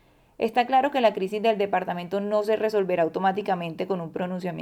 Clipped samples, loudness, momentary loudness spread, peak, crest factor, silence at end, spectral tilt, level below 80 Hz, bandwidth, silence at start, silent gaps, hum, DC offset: under 0.1%; -25 LUFS; 8 LU; -8 dBFS; 16 dB; 0 s; -6.5 dB/octave; -68 dBFS; 15.5 kHz; 0.4 s; none; none; under 0.1%